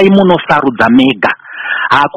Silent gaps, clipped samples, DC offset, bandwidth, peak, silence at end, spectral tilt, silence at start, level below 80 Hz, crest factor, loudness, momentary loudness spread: none; 1%; under 0.1%; 8.4 kHz; 0 dBFS; 0.1 s; -7 dB/octave; 0 s; -44 dBFS; 10 dB; -10 LUFS; 8 LU